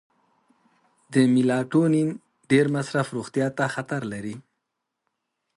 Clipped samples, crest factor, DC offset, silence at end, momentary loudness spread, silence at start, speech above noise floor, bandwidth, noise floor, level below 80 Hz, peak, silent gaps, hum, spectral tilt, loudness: under 0.1%; 18 dB; under 0.1%; 1.15 s; 13 LU; 1.1 s; 59 dB; 11.5 kHz; -81 dBFS; -68 dBFS; -6 dBFS; none; none; -6.5 dB/octave; -24 LUFS